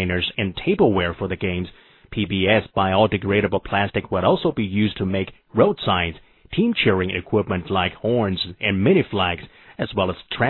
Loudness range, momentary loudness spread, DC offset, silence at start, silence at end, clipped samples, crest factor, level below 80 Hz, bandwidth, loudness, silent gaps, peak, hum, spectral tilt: 1 LU; 9 LU; under 0.1%; 0 s; 0 s; under 0.1%; 18 dB; -46 dBFS; 4.3 kHz; -21 LUFS; none; -2 dBFS; none; -9.5 dB/octave